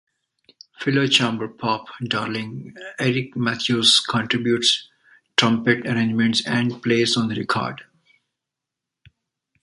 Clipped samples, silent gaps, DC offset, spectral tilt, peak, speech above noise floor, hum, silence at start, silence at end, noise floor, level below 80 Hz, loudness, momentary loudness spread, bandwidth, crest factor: under 0.1%; none; under 0.1%; -4 dB/octave; -2 dBFS; 64 dB; none; 0.8 s; 1.8 s; -85 dBFS; -62 dBFS; -20 LUFS; 10 LU; 11.5 kHz; 20 dB